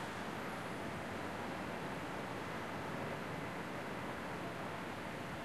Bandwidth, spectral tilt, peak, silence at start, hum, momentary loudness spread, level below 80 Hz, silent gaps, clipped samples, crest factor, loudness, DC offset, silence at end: 13 kHz; -5 dB/octave; -30 dBFS; 0 s; none; 1 LU; -66 dBFS; none; under 0.1%; 12 dB; -43 LUFS; 0.1%; 0 s